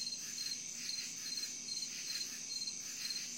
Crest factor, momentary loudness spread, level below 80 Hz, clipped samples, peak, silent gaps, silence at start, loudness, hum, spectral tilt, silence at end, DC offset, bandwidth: 14 dB; 1 LU; -86 dBFS; under 0.1%; -28 dBFS; none; 0 s; -40 LUFS; none; 1.5 dB/octave; 0 s; under 0.1%; 16.5 kHz